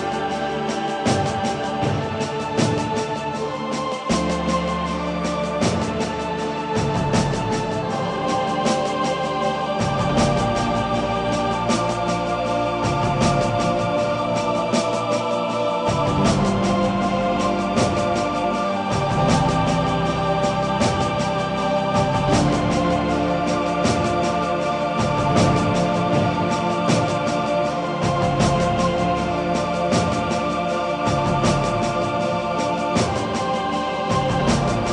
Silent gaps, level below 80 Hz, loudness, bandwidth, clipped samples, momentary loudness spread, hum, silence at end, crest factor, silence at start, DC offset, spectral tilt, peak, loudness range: none; -40 dBFS; -21 LUFS; 11 kHz; under 0.1%; 5 LU; none; 0 s; 16 dB; 0 s; under 0.1%; -5.5 dB/octave; -6 dBFS; 3 LU